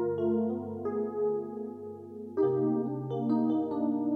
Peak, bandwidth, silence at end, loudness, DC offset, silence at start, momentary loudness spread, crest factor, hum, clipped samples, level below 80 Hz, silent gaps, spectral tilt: -18 dBFS; 4.9 kHz; 0 s; -31 LUFS; under 0.1%; 0 s; 12 LU; 14 dB; 50 Hz at -75 dBFS; under 0.1%; -78 dBFS; none; -11 dB/octave